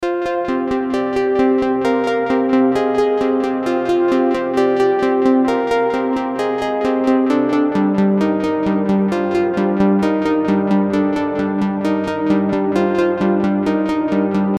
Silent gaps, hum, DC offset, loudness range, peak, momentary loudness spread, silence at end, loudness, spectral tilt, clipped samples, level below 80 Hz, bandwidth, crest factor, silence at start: none; none; under 0.1%; 1 LU; -4 dBFS; 4 LU; 0 s; -17 LUFS; -7.5 dB/octave; under 0.1%; -48 dBFS; 11 kHz; 12 dB; 0 s